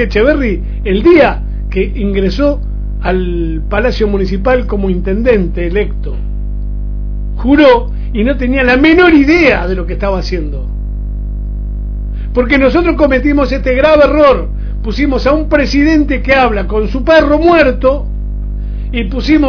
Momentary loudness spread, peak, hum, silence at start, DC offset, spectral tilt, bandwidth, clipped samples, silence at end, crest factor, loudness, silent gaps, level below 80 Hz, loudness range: 14 LU; 0 dBFS; 50 Hz at -20 dBFS; 0 s; under 0.1%; -7.5 dB/octave; 5.4 kHz; 0.7%; 0 s; 10 dB; -12 LUFS; none; -18 dBFS; 5 LU